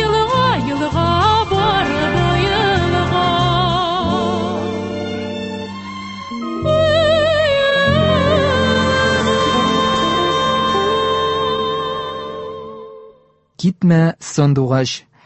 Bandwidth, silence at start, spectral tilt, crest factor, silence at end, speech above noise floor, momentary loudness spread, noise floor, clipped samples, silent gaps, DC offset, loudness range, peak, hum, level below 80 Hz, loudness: 8.4 kHz; 0 s; -5.5 dB/octave; 14 dB; 0.25 s; 36 dB; 12 LU; -51 dBFS; under 0.1%; none; under 0.1%; 5 LU; -2 dBFS; none; -34 dBFS; -16 LUFS